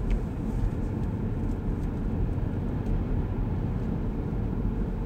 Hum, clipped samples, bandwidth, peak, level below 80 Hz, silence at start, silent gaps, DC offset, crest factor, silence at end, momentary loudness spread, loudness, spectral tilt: none; under 0.1%; 6.6 kHz; -14 dBFS; -32 dBFS; 0 s; none; under 0.1%; 14 dB; 0 s; 1 LU; -31 LUFS; -9.5 dB/octave